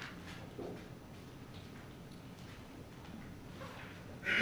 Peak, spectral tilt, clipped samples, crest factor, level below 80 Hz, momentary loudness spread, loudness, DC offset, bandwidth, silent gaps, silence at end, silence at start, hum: -20 dBFS; -4.5 dB/octave; under 0.1%; 24 dB; -64 dBFS; 5 LU; -48 LUFS; under 0.1%; over 20 kHz; none; 0 s; 0 s; none